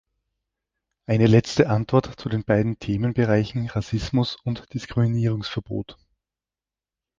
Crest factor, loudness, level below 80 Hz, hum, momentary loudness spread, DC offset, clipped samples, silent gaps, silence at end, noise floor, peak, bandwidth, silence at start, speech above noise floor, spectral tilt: 20 dB; -23 LUFS; -46 dBFS; none; 12 LU; under 0.1%; under 0.1%; none; 1.25 s; under -90 dBFS; -2 dBFS; 7.6 kHz; 1.1 s; over 68 dB; -7.5 dB/octave